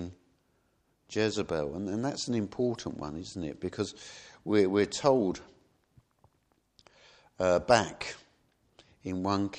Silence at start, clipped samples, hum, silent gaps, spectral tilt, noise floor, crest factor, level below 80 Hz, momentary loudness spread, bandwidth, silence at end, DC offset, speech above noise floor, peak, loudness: 0 s; under 0.1%; none; none; -5 dB/octave; -73 dBFS; 26 dB; -60 dBFS; 16 LU; 10 kHz; 0 s; under 0.1%; 43 dB; -6 dBFS; -30 LUFS